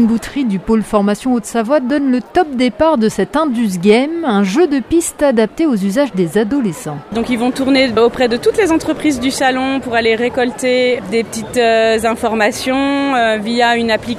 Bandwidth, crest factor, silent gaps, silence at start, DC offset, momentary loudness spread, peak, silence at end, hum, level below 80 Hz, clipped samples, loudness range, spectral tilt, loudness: 15.5 kHz; 14 dB; none; 0 s; under 0.1%; 5 LU; 0 dBFS; 0 s; none; -42 dBFS; under 0.1%; 1 LU; -5 dB/octave; -14 LUFS